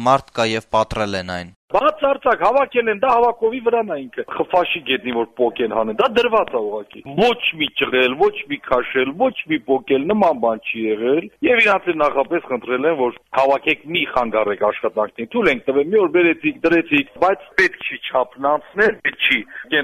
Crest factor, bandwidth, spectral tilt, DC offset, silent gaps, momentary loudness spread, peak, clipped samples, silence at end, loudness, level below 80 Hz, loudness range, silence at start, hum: 16 dB; 13.5 kHz; -5 dB/octave; under 0.1%; 1.56-1.68 s; 7 LU; -2 dBFS; under 0.1%; 0 s; -18 LUFS; -50 dBFS; 2 LU; 0 s; none